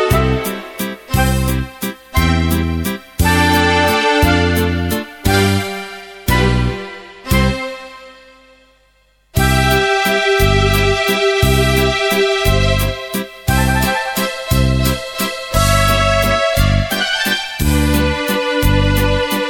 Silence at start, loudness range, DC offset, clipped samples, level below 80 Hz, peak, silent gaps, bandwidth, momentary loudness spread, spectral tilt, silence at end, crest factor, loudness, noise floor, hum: 0 s; 5 LU; under 0.1%; under 0.1%; -22 dBFS; 0 dBFS; none; 17.5 kHz; 10 LU; -4.5 dB/octave; 0 s; 14 dB; -15 LUFS; -55 dBFS; 50 Hz at -40 dBFS